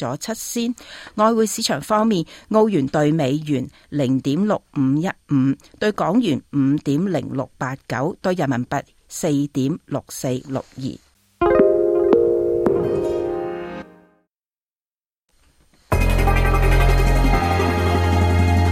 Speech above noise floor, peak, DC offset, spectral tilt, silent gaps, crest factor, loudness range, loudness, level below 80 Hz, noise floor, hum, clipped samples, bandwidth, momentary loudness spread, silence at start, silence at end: over 69 dB; -2 dBFS; under 0.1%; -6 dB/octave; 14.63-14.67 s, 14.81-14.85 s; 18 dB; 5 LU; -20 LUFS; -28 dBFS; under -90 dBFS; none; under 0.1%; 16 kHz; 10 LU; 0 s; 0 s